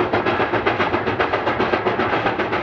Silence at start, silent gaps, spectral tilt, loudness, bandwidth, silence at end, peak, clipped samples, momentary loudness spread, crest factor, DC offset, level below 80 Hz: 0 s; none; -6.5 dB/octave; -20 LUFS; 7.2 kHz; 0 s; -6 dBFS; under 0.1%; 1 LU; 14 dB; under 0.1%; -46 dBFS